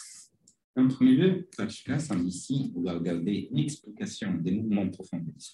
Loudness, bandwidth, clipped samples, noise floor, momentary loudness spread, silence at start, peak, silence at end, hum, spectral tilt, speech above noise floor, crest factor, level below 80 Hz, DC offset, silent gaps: -29 LUFS; 11.5 kHz; under 0.1%; -55 dBFS; 15 LU; 0 s; -12 dBFS; 0.05 s; none; -6.5 dB/octave; 27 dB; 16 dB; -66 dBFS; under 0.1%; 0.64-0.74 s